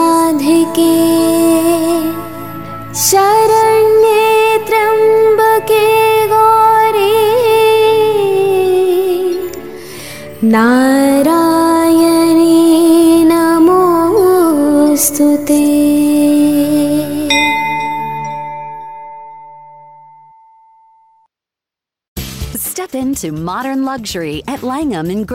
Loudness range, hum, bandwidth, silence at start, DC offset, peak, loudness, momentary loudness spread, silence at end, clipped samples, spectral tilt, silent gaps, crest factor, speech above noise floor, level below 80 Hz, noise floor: 13 LU; none; 17 kHz; 0 s; 0.8%; 0 dBFS; -11 LUFS; 15 LU; 0 s; under 0.1%; -4 dB/octave; 22.08-22.16 s; 10 dB; 72 dB; -42 dBFS; -86 dBFS